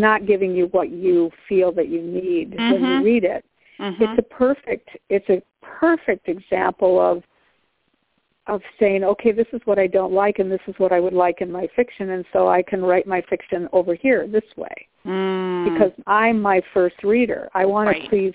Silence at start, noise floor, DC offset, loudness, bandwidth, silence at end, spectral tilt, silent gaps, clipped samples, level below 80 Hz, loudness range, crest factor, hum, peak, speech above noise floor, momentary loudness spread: 0 s; -69 dBFS; under 0.1%; -20 LUFS; 4 kHz; 0 s; -10 dB/octave; none; under 0.1%; -56 dBFS; 2 LU; 18 dB; none; -2 dBFS; 50 dB; 8 LU